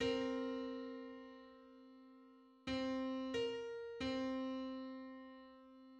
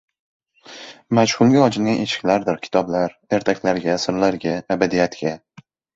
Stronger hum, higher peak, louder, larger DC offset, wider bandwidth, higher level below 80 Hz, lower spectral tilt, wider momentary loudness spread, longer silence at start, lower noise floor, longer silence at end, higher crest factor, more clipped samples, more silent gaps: neither; second, -28 dBFS vs 0 dBFS; second, -44 LUFS vs -19 LUFS; neither; about the same, 8.6 kHz vs 8 kHz; second, -70 dBFS vs -56 dBFS; about the same, -5 dB/octave vs -5.5 dB/octave; first, 20 LU vs 12 LU; second, 0 s vs 0.7 s; first, -65 dBFS vs -41 dBFS; second, 0 s vs 0.6 s; about the same, 18 dB vs 20 dB; neither; neither